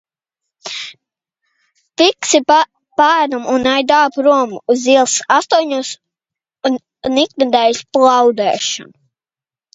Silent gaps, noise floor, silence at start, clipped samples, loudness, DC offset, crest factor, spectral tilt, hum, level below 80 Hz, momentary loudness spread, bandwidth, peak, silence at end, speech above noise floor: none; under -90 dBFS; 0.65 s; under 0.1%; -13 LUFS; under 0.1%; 16 dB; -1.5 dB/octave; none; -58 dBFS; 14 LU; 8 kHz; 0 dBFS; 0.9 s; over 77 dB